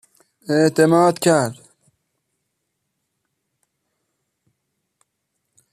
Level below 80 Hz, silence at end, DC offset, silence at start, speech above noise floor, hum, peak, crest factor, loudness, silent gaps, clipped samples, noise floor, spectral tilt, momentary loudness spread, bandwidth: -64 dBFS; 4.2 s; under 0.1%; 0.5 s; 60 dB; none; -2 dBFS; 20 dB; -17 LUFS; none; under 0.1%; -76 dBFS; -5.5 dB/octave; 11 LU; 14.5 kHz